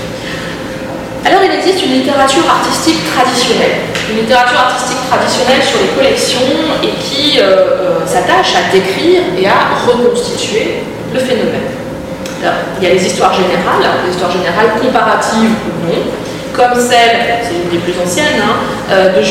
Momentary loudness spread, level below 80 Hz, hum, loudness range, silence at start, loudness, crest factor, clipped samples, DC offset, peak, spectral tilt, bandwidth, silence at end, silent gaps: 9 LU; -40 dBFS; none; 3 LU; 0 s; -11 LUFS; 10 dB; under 0.1%; under 0.1%; 0 dBFS; -3.5 dB/octave; 16.5 kHz; 0 s; none